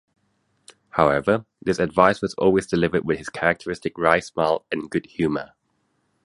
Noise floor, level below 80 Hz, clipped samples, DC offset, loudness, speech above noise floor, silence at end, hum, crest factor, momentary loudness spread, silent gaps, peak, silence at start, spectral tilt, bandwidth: -70 dBFS; -50 dBFS; under 0.1%; under 0.1%; -22 LUFS; 48 dB; 0.8 s; none; 22 dB; 9 LU; none; 0 dBFS; 0.95 s; -6 dB/octave; 11.5 kHz